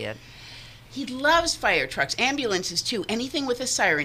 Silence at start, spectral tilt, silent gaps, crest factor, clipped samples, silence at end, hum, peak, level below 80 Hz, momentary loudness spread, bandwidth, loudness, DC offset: 0 s; -2 dB/octave; none; 18 dB; under 0.1%; 0 s; none; -8 dBFS; -50 dBFS; 20 LU; 15.5 kHz; -24 LUFS; under 0.1%